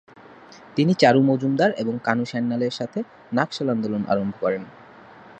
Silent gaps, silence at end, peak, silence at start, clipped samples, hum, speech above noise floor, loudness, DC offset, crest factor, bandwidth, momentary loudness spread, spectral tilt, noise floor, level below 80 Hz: none; 0.05 s; -2 dBFS; 0.3 s; under 0.1%; none; 25 dB; -22 LUFS; under 0.1%; 22 dB; 8.6 kHz; 13 LU; -6.5 dB/octave; -46 dBFS; -64 dBFS